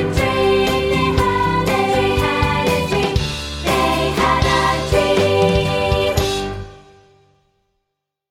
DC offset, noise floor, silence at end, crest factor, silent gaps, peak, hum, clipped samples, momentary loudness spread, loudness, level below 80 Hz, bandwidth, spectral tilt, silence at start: under 0.1%; -77 dBFS; 1.5 s; 16 dB; none; -2 dBFS; none; under 0.1%; 6 LU; -17 LUFS; -30 dBFS; 17 kHz; -5 dB/octave; 0 s